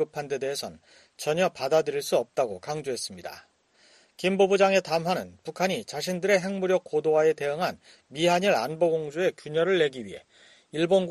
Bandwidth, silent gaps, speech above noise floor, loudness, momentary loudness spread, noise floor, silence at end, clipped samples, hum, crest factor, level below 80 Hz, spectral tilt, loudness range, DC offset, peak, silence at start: 13 kHz; none; 34 dB; -26 LUFS; 12 LU; -60 dBFS; 0 s; under 0.1%; none; 18 dB; -70 dBFS; -4.5 dB/octave; 4 LU; under 0.1%; -8 dBFS; 0 s